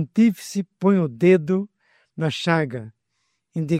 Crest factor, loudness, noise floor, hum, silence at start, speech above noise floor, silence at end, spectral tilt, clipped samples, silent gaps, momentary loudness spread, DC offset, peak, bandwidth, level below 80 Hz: 18 dB; -21 LUFS; -74 dBFS; none; 0 s; 53 dB; 0 s; -7 dB/octave; under 0.1%; none; 16 LU; under 0.1%; -4 dBFS; 15 kHz; -64 dBFS